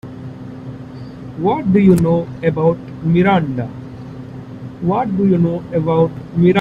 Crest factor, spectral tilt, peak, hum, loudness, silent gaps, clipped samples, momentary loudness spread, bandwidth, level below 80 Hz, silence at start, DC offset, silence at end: 16 dB; -9 dB/octave; 0 dBFS; none; -16 LUFS; none; under 0.1%; 19 LU; 10 kHz; -44 dBFS; 0.05 s; under 0.1%; 0 s